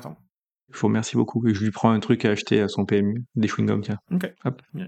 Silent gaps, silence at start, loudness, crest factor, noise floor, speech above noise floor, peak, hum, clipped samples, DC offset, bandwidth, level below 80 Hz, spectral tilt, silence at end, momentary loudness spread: 0.30-0.67 s; 0 s; -23 LUFS; 22 dB; -66 dBFS; 43 dB; -2 dBFS; none; under 0.1%; under 0.1%; 12.5 kHz; -66 dBFS; -6.5 dB/octave; 0 s; 8 LU